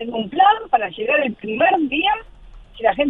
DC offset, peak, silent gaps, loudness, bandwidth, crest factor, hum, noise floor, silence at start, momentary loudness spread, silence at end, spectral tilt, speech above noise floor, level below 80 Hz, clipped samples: under 0.1%; -2 dBFS; none; -18 LUFS; 4 kHz; 18 dB; none; -41 dBFS; 0 s; 8 LU; 0 s; -7 dB/octave; 23 dB; -48 dBFS; under 0.1%